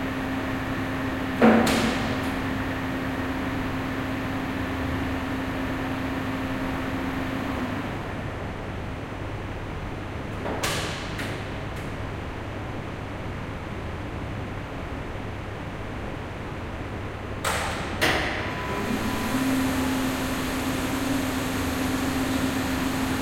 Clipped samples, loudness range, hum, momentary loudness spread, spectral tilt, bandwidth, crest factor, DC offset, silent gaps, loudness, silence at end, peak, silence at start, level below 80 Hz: under 0.1%; 9 LU; none; 9 LU; -5 dB/octave; 16 kHz; 22 dB; under 0.1%; none; -28 LUFS; 0 s; -4 dBFS; 0 s; -40 dBFS